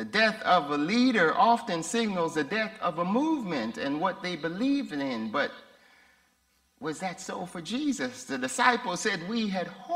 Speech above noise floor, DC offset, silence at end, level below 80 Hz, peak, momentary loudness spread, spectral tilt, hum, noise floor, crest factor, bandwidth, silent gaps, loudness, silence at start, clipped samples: 41 dB; under 0.1%; 0 s; -70 dBFS; -6 dBFS; 11 LU; -4 dB/octave; none; -69 dBFS; 22 dB; 15.5 kHz; none; -28 LUFS; 0 s; under 0.1%